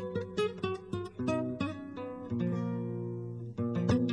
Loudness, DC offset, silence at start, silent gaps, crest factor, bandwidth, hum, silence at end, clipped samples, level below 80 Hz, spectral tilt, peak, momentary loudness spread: -35 LUFS; under 0.1%; 0 s; none; 18 dB; 10.5 kHz; none; 0 s; under 0.1%; -60 dBFS; -7.5 dB/octave; -16 dBFS; 8 LU